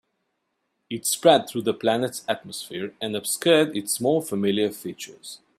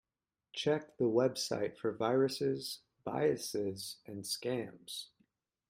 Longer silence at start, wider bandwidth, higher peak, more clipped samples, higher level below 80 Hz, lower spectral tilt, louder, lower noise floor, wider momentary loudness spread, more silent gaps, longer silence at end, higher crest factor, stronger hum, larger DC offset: first, 0.9 s vs 0.55 s; about the same, 16 kHz vs 16 kHz; first, -4 dBFS vs -18 dBFS; neither; first, -70 dBFS vs -76 dBFS; about the same, -3.5 dB/octave vs -4.5 dB/octave; first, -23 LUFS vs -36 LUFS; second, -76 dBFS vs under -90 dBFS; first, 16 LU vs 13 LU; neither; second, 0.2 s vs 0.65 s; about the same, 22 dB vs 20 dB; neither; neither